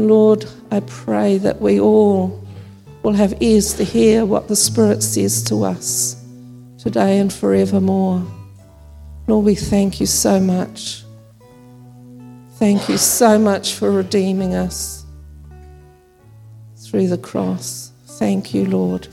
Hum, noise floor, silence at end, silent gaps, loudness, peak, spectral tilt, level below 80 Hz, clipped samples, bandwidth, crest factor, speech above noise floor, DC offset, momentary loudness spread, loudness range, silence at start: none; -46 dBFS; 0.05 s; none; -16 LUFS; 0 dBFS; -5 dB/octave; -42 dBFS; under 0.1%; 16 kHz; 16 dB; 31 dB; under 0.1%; 13 LU; 8 LU; 0 s